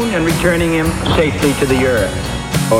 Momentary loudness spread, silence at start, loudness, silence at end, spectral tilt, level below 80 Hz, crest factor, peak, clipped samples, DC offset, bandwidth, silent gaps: 5 LU; 0 s; -15 LUFS; 0 s; -5 dB/octave; -28 dBFS; 14 dB; 0 dBFS; under 0.1%; under 0.1%; 16.5 kHz; none